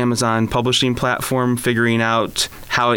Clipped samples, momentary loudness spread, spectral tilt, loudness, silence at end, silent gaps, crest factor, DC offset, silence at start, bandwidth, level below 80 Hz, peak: under 0.1%; 3 LU; -4 dB/octave; -18 LUFS; 0 s; none; 14 dB; under 0.1%; 0 s; 18.5 kHz; -42 dBFS; -4 dBFS